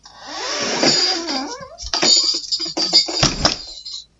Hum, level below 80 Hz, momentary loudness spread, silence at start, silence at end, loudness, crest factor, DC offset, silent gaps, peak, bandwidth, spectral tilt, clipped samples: none; -42 dBFS; 17 LU; 0.05 s; 0.15 s; -16 LUFS; 20 dB; under 0.1%; none; 0 dBFS; 8.2 kHz; -1.5 dB/octave; under 0.1%